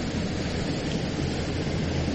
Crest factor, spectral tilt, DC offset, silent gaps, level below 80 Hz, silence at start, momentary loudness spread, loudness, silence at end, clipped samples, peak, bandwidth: 14 dB; -5.5 dB/octave; under 0.1%; none; -38 dBFS; 0 s; 1 LU; -29 LUFS; 0 s; under 0.1%; -14 dBFS; 9.4 kHz